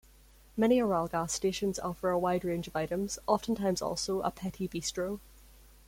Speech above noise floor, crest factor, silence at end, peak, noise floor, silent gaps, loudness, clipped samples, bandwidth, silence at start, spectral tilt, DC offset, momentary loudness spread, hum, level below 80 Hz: 27 dB; 20 dB; 0.5 s; -12 dBFS; -58 dBFS; none; -32 LUFS; under 0.1%; 16.5 kHz; 0.55 s; -4.5 dB/octave; under 0.1%; 9 LU; none; -56 dBFS